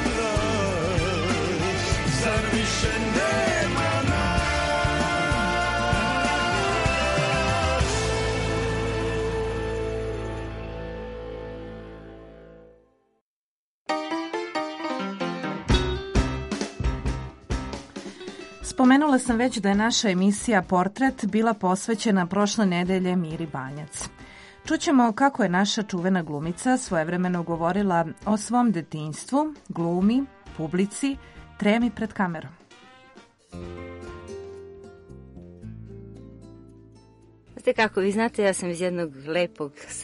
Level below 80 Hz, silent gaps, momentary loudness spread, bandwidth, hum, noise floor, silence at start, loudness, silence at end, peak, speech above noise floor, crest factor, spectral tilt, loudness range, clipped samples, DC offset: -38 dBFS; 13.21-13.86 s; 17 LU; 11.5 kHz; none; under -90 dBFS; 0 s; -24 LUFS; 0 s; -4 dBFS; over 66 dB; 20 dB; -5 dB/octave; 13 LU; under 0.1%; under 0.1%